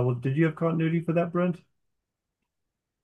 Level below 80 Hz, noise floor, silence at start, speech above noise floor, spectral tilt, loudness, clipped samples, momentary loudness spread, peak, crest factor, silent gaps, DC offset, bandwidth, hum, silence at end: -74 dBFS; -84 dBFS; 0 s; 58 dB; -10 dB/octave; -26 LUFS; under 0.1%; 4 LU; -10 dBFS; 18 dB; none; under 0.1%; 3.7 kHz; none; 1.45 s